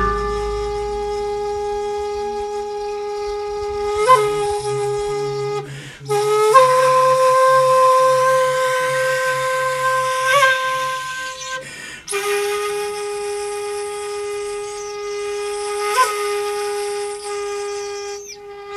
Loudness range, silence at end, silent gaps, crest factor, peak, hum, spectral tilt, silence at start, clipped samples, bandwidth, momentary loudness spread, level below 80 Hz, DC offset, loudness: 10 LU; 0 s; none; 18 dB; 0 dBFS; none; -2.5 dB/octave; 0 s; under 0.1%; 14 kHz; 13 LU; -42 dBFS; under 0.1%; -19 LUFS